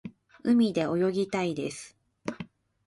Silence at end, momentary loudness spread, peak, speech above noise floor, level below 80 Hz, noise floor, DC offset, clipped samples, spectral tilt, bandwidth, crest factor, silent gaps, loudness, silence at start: 0.4 s; 21 LU; -14 dBFS; 20 dB; -66 dBFS; -46 dBFS; under 0.1%; under 0.1%; -6 dB/octave; 11.5 kHz; 16 dB; none; -28 LUFS; 0.05 s